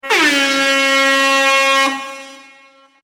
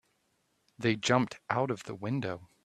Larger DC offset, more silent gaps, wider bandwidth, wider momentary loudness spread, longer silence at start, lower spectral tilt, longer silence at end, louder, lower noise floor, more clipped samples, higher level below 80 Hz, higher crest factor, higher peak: neither; neither; first, 16.5 kHz vs 12.5 kHz; first, 13 LU vs 8 LU; second, 0.05 s vs 0.8 s; second, 0 dB/octave vs -5 dB/octave; first, 0.65 s vs 0.2 s; first, -12 LUFS vs -32 LUFS; second, -47 dBFS vs -75 dBFS; neither; about the same, -70 dBFS vs -68 dBFS; second, 14 dB vs 22 dB; first, -2 dBFS vs -10 dBFS